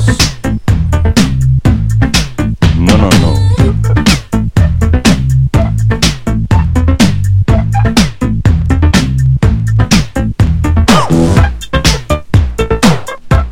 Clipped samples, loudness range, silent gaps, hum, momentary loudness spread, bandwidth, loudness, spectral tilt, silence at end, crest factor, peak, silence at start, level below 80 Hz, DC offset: 0.6%; 1 LU; none; none; 4 LU; 16 kHz; -10 LUFS; -5.5 dB/octave; 0 s; 8 dB; 0 dBFS; 0 s; -16 dBFS; under 0.1%